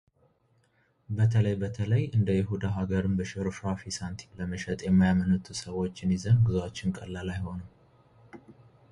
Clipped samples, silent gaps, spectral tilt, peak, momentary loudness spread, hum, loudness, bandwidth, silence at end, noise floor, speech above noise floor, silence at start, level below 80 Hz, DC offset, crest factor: under 0.1%; none; -7 dB/octave; -12 dBFS; 12 LU; none; -29 LUFS; 11 kHz; 0.4 s; -68 dBFS; 41 dB; 1.1 s; -48 dBFS; under 0.1%; 16 dB